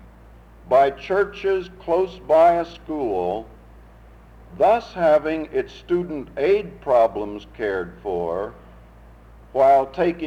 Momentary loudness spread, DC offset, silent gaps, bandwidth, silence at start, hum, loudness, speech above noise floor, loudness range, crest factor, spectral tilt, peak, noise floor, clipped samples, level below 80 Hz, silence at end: 12 LU; under 0.1%; none; 7.8 kHz; 0.65 s; none; -21 LUFS; 26 dB; 3 LU; 16 dB; -7 dB/octave; -6 dBFS; -46 dBFS; under 0.1%; -48 dBFS; 0 s